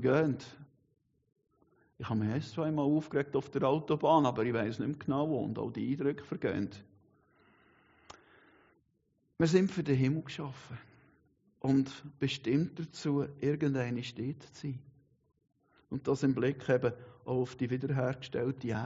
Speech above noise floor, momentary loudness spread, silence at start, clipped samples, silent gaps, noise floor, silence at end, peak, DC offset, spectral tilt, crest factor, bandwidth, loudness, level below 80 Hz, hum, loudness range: 44 dB; 13 LU; 0 s; under 0.1%; none; -76 dBFS; 0 s; -14 dBFS; under 0.1%; -6.5 dB/octave; 20 dB; 7.6 kHz; -33 LUFS; -68 dBFS; none; 6 LU